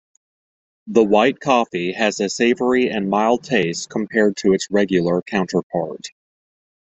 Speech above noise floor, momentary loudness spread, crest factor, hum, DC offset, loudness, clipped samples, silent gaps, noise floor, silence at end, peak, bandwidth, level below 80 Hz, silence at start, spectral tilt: over 72 dB; 8 LU; 18 dB; none; under 0.1%; -19 LUFS; under 0.1%; 5.63-5.70 s; under -90 dBFS; 0.8 s; -2 dBFS; 8.2 kHz; -58 dBFS; 0.85 s; -5 dB/octave